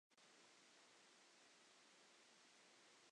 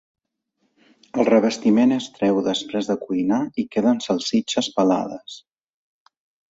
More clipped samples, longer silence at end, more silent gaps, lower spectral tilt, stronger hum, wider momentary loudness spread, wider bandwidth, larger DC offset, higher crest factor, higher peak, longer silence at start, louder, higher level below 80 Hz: neither; second, 0 s vs 1.1 s; neither; second, -0.5 dB/octave vs -5 dB/octave; neither; second, 0 LU vs 10 LU; first, 10 kHz vs 8 kHz; neither; about the same, 14 dB vs 18 dB; second, -58 dBFS vs -4 dBFS; second, 0.1 s vs 1.15 s; second, -69 LUFS vs -21 LUFS; second, under -90 dBFS vs -64 dBFS